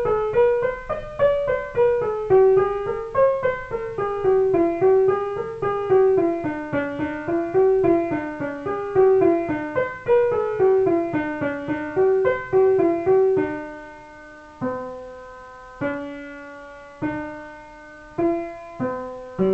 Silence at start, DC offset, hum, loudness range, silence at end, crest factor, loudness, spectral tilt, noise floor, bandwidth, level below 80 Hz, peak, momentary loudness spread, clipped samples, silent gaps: 0 s; under 0.1%; none; 11 LU; 0 s; 14 dB; -21 LUFS; -8.5 dB/octave; -42 dBFS; 5 kHz; -48 dBFS; -8 dBFS; 19 LU; under 0.1%; none